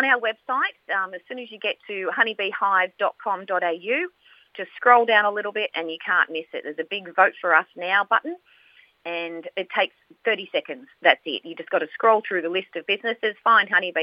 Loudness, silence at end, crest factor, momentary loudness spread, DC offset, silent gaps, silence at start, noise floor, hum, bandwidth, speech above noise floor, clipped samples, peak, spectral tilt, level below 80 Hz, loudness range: -23 LUFS; 0 s; 24 dB; 13 LU; under 0.1%; none; 0 s; -56 dBFS; none; 5.4 kHz; 33 dB; under 0.1%; 0 dBFS; -5.5 dB/octave; -90 dBFS; 4 LU